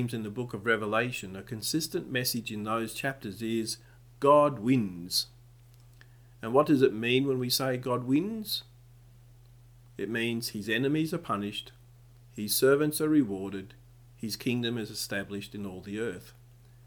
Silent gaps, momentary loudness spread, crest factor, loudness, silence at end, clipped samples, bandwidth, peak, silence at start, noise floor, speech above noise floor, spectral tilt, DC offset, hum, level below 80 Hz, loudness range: none; 15 LU; 22 dB; -29 LUFS; 0.55 s; under 0.1%; over 20 kHz; -8 dBFS; 0 s; -55 dBFS; 26 dB; -4.5 dB/octave; under 0.1%; none; -62 dBFS; 5 LU